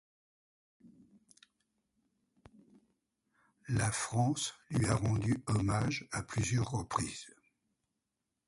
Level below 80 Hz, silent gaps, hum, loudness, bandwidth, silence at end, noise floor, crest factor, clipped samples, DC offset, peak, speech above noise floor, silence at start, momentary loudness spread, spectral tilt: -56 dBFS; none; none; -34 LUFS; 11.5 kHz; 1.2 s; -87 dBFS; 22 dB; under 0.1%; under 0.1%; -16 dBFS; 54 dB; 0.85 s; 7 LU; -5 dB/octave